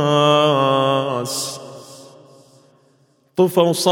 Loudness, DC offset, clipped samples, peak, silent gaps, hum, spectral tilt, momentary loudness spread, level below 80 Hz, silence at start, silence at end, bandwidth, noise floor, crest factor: -17 LUFS; under 0.1%; under 0.1%; 0 dBFS; none; none; -4.5 dB/octave; 18 LU; -68 dBFS; 0 s; 0 s; 17.5 kHz; -58 dBFS; 18 dB